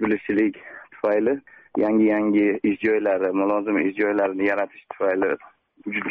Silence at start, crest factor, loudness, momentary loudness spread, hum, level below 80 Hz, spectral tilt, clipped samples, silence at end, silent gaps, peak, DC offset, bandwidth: 0 s; 12 dB; -22 LUFS; 11 LU; none; -62 dBFS; -5.5 dB/octave; under 0.1%; 0 s; none; -10 dBFS; under 0.1%; 4.1 kHz